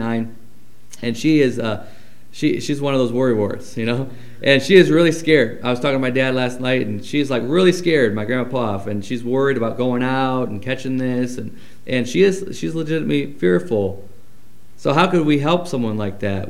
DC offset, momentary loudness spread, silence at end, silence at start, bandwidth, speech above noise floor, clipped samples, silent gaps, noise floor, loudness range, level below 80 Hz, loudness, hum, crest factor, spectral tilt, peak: 3%; 10 LU; 0 s; 0 s; 15.5 kHz; 33 dB; under 0.1%; none; -51 dBFS; 5 LU; -58 dBFS; -19 LUFS; none; 18 dB; -6 dB/octave; 0 dBFS